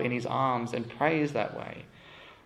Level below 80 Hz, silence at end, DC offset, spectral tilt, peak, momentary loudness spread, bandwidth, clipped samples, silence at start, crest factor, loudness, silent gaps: -66 dBFS; 0.1 s; under 0.1%; -6.5 dB/octave; -12 dBFS; 22 LU; 12 kHz; under 0.1%; 0 s; 20 dB; -30 LUFS; none